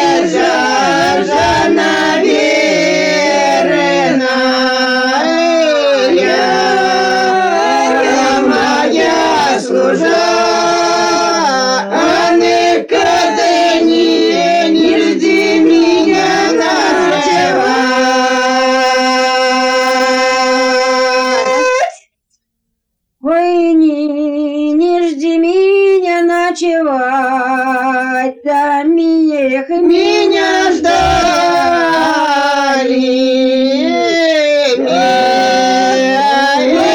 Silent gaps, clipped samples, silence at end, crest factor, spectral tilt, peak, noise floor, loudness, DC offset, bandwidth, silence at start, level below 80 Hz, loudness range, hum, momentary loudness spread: none; under 0.1%; 0 s; 10 dB; -3.5 dB/octave; -2 dBFS; -70 dBFS; -11 LUFS; under 0.1%; 17.5 kHz; 0 s; -44 dBFS; 2 LU; none; 3 LU